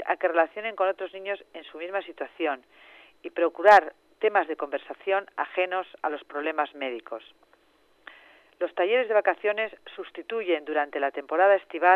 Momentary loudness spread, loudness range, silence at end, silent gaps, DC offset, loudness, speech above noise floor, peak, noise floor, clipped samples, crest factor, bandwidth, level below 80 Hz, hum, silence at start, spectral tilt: 16 LU; 7 LU; 0 s; none; under 0.1%; -26 LUFS; 37 dB; -6 dBFS; -63 dBFS; under 0.1%; 22 dB; 8 kHz; -78 dBFS; none; 0 s; -3.5 dB/octave